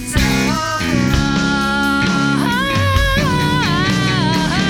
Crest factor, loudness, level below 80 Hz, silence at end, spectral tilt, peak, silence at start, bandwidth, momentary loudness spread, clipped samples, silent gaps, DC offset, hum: 14 dB; -15 LUFS; -26 dBFS; 0 s; -5 dB/octave; -2 dBFS; 0 s; 19.5 kHz; 1 LU; under 0.1%; none; under 0.1%; none